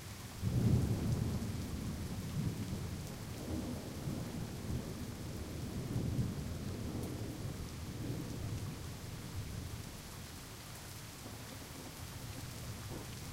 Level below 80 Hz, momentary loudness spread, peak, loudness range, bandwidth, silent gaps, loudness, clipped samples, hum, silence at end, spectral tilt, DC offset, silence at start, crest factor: -50 dBFS; 11 LU; -20 dBFS; 9 LU; 16.5 kHz; none; -42 LUFS; under 0.1%; none; 0 s; -6 dB/octave; under 0.1%; 0 s; 20 dB